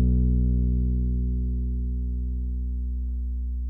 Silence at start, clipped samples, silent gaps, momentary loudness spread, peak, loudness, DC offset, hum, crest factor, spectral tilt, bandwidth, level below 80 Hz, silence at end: 0 s; under 0.1%; none; 8 LU; -12 dBFS; -27 LUFS; under 0.1%; 60 Hz at -60 dBFS; 12 dB; -14 dB/octave; 0.7 kHz; -26 dBFS; 0 s